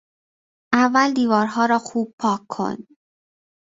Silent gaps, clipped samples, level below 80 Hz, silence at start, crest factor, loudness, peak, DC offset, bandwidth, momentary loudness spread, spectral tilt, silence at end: 2.13-2.18 s; under 0.1%; -64 dBFS; 0.7 s; 20 dB; -20 LUFS; -2 dBFS; under 0.1%; 7.8 kHz; 10 LU; -5 dB/octave; 0.95 s